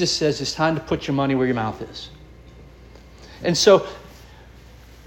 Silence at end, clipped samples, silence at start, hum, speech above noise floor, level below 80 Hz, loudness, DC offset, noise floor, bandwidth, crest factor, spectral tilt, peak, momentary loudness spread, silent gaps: 0.65 s; under 0.1%; 0 s; none; 24 dB; -46 dBFS; -20 LUFS; under 0.1%; -45 dBFS; 17 kHz; 22 dB; -4.5 dB/octave; -2 dBFS; 20 LU; none